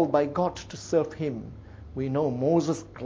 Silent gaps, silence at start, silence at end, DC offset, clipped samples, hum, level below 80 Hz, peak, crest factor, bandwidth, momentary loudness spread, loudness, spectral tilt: none; 0 s; 0 s; under 0.1%; under 0.1%; none; -52 dBFS; -10 dBFS; 18 dB; 8 kHz; 15 LU; -27 LUFS; -7 dB/octave